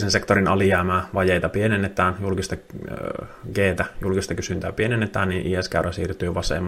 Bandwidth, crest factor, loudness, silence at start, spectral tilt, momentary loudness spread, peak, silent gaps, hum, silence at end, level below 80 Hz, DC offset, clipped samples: 15 kHz; 20 dB; -23 LUFS; 0 s; -5.5 dB/octave; 12 LU; -2 dBFS; none; none; 0 s; -42 dBFS; under 0.1%; under 0.1%